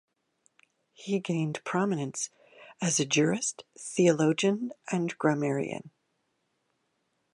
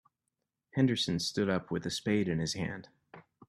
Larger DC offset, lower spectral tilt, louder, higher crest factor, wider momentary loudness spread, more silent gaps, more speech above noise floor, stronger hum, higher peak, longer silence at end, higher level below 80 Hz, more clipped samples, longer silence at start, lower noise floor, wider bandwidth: neither; about the same, -4.5 dB/octave vs -5 dB/octave; first, -29 LUFS vs -32 LUFS; about the same, 20 dB vs 18 dB; about the same, 11 LU vs 10 LU; neither; second, 49 dB vs 55 dB; neither; first, -10 dBFS vs -16 dBFS; first, 1.45 s vs 0.3 s; second, -78 dBFS vs -64 dBFS; neither; first, 1 s vs 0.75 s; second, -77 dBFS vs -86 dBFS; second, 11.5 kHz vs 13.5 kHz